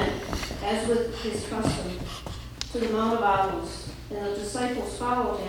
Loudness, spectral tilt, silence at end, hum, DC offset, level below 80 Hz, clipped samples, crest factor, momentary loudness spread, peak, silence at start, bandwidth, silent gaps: -28 LUFS; -5 dB/octave; 0 s; none; under 0.1%; -42 dBFS; under 0.1%; 20 dB; 12 LU; -8 dBFS; 0 s; 20 kHz; none